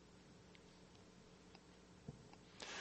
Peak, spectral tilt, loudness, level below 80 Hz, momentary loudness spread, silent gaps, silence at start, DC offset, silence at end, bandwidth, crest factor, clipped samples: -30 dBFS; -3.5 dB/octave; -61 LUFS; -74 dBFS; 8 LU; none; 0 s; under 0.1%; 0 s; 8.4 kHz; 28 dB; under 0.1%